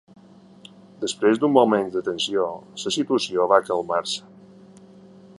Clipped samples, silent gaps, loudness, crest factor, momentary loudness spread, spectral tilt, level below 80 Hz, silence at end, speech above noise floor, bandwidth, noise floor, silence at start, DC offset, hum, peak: under 0.1%; none; -22 LUFS; 22 dB; 12 LU; -4 dB/octave; -68 dBFS; 1.2 s; 26 dB; 11.5 kHz; -48 dBFS; 1 s; under 0.1%; none; -2 dBFS